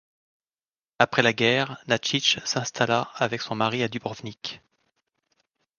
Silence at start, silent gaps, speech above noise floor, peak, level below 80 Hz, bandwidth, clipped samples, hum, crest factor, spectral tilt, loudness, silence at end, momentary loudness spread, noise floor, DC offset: 1 s; none; over 65 dB; 0 dBFS; -66 dBFS; 10.5 kHz; under 0.1%; none; 26 dB; -3.5 dB/octave; -24 LUFS; 1.2 s; 14 LU; under -90 dBFS; under 0.1%